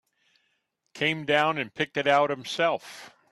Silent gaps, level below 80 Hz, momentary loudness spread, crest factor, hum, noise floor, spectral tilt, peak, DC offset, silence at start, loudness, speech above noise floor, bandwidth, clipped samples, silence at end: none; -72 dBFS; 10 LU; 20 dB; none; -75 dBFS; -4.5 dB/octave; -8 dBFS; under 0.1%; 0.95 s; -26 LUFS; 49 dB; 12.5 kHz; under 0.1%; 0.25 s